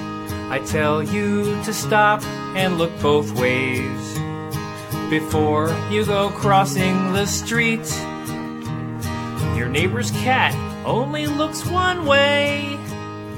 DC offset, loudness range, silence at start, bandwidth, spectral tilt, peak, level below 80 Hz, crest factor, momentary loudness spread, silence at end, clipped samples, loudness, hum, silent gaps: under 0.1%; 3 LU; 0 s; 17.5 kHz; -5 dB/octave; -2 dBFS; -46 dBFS; 20 dB; 12 LU; 0 s; under 0.1%; -20 LUFS; none; none